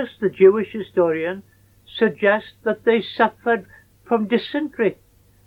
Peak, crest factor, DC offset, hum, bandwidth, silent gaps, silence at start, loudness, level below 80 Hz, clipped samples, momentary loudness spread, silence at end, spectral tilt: -2 dBFS; 18 dB; under 0.1%; none; 5 kHz; none; 0 s; -20 LUFS; -60 dBFS; under 0.1%; 10 LU; 0.55 s; -7.5 dB/octave